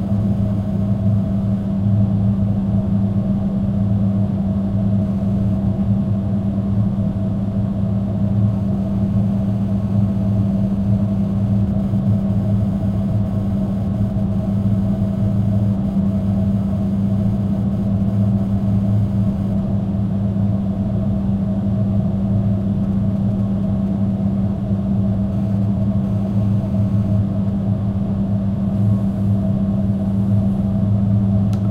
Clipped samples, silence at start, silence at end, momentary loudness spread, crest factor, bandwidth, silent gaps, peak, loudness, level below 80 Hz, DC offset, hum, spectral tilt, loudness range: under 0.1%; 0 s; 0 s; 2 LU; 12 dB; 4.4 kHz; none; -6 dBFS; -19 LUFS; -34 dBFS; under 0.1%; none; -11 dB/octave; 1 LU